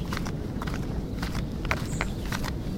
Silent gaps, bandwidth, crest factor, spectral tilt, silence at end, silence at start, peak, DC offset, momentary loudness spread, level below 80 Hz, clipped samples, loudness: none; 16.5 kHz; 24 dB; -5.5 dB/octave; 0 s; 0 s; -6 dBFS; under 0.1%; 3 LU; -36 dBFS; under 0.1%; -31 LUFS